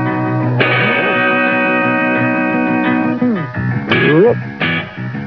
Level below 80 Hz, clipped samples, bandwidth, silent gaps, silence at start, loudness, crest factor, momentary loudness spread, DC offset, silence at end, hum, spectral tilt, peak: -52 dBFS; under 0.1%; 5.4 kHz; none; 0 s; -14 LUFS; 14 dB; 6 LU; 0.2%; 0 s; none; -8.5 dB/octave; 0 dBFS